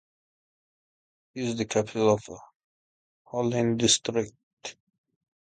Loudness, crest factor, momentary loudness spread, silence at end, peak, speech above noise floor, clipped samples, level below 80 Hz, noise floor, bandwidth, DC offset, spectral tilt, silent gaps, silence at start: -26 LUFS; 22 dB; 19 LU; 0.7 s; -8 dBFS; over 64 dB; under 0.1%; -62 dBFS; under -90 dBFS; 9.4 kHz; under 0.1%; -4 dB/octave; 2.56-3.25 s, 4.43-4.57 s; 1.35 s